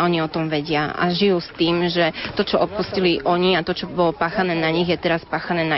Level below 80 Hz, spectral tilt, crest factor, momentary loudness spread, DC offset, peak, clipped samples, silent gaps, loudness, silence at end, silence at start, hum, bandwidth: -48 dBFS; -3.5 dB/octave; 14 dB; 4 LU; under 0.1%; -6 dBFS; under 0.1%; none; -20 LUFS; 0 s; 0 s; none; 6 kHz